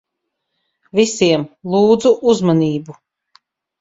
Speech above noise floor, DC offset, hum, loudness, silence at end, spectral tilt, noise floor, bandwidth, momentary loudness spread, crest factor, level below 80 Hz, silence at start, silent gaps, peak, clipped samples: 61 dB; under 0.1%; none; -15 LUFS; 0.9 s; -5.5 dB/octave; -76 dBFS; 7.8 kHz; 8 LU; 16 dB; -56 dBFS; 0.95 s; none; 0 dBFS; under 0.1%